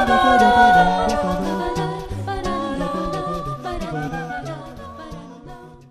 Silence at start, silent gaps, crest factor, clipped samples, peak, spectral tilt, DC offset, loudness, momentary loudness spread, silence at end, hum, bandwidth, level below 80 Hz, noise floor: 0 s; none; 18 dB; under 0.1%; -2 dBFS; -5.5 dB/octave; under 0.1%; -19 LUFS; 23 LU; 0.15 s; none; 13.5 kHz; -36 dBFS; -40 dBFS